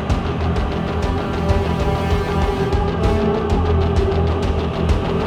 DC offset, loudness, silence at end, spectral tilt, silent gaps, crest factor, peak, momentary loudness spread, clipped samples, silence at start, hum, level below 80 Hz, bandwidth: under 0.1%; -19 LUFS; 0 s; -7.5 dB/octave; none; 14 dB; -4 dBFS; 3 LU; under 0.1%; 0 s; none; -24 dBFS; 10 kHz